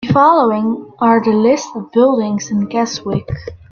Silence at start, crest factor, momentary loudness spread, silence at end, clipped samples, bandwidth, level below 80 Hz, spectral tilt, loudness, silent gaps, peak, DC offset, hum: 0 s; 14 dB; 10 LU; 0.15 s; under 0.1%; 7.2 kHz; -46 dBFS; -6 dB/octave; -14 LUFS; none; 0 dBFS; under 0.1%; none